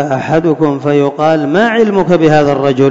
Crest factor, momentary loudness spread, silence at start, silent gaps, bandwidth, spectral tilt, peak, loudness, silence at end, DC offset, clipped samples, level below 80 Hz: 10 dB; 4 LU; 0 s; none; 7.8 kHz; -7 dB/octave; 0 dBFS; -11 LUFS; 0 s; under 0.1%; under 0.1%; -44 dBFS